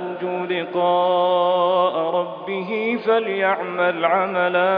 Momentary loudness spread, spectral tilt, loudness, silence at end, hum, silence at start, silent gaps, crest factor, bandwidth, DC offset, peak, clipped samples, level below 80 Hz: 7 LU; -8 dB/octave; -20 LUFS; 0 s; none; 0 s; none; 16 dB; 5.2 kHz; under 0.1%; -4 dBFS; under 0.1%; -72 dBFS